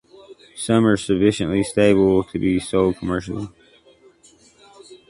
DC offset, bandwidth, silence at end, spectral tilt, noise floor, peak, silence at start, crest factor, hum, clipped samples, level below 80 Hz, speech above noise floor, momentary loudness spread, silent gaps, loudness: under 0.1%; 11.5 kHz; 0.15 s; -6 dB/octave; -53 dBFS; -2 dBFS; 0.3 s; 18 dB; none; under 0.1%; -46 dBFS; 34 dB; 14 LU; none; -19 LUFS